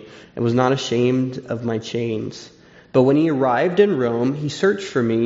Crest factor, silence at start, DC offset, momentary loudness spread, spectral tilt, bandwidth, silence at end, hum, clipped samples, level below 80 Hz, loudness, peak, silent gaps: 16 dB; 0 s; under 0.1%; 9 LU; -5.5 dB/octave; 7.8 kHz; 0 s; none; under 0.1%; -58 dBFS; -20 LUFS; -2 dBFS; none